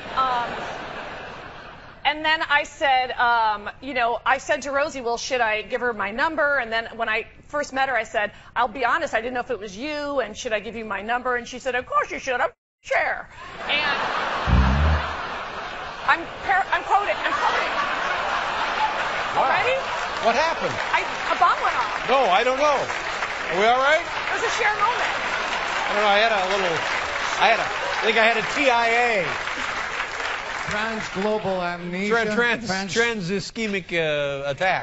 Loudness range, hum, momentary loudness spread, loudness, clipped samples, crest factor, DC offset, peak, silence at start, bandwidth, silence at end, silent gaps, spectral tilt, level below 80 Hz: 5 LU; none; 9 LU; -22 LUFS; under 0.1%; 22 dB; under 0.1%; -2 dBFS; 0 s; 8 kHz; 0 s; 12.58-12.78 s; -2 dB/octave; -38 dBFS